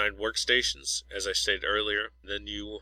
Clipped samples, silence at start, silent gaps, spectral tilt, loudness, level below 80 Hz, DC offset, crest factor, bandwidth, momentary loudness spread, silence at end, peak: under 0.1%; 0 s; none; -1 dB/octave; -28 LUFS; -50 dBFS; under 0.1%; 20 dB; 16 kHz; 10 LU; 0 s; -10 dBFS